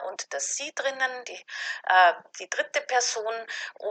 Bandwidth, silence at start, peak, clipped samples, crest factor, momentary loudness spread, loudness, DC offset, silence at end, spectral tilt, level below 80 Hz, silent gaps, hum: 9.2 kHz; 0 s; -8 dBFS; under 0.1%; 20 dB; 15 LU; -26 LUFS; under 0.1%; 0 s; 2 dB/octave; under -90 dBFS; none; none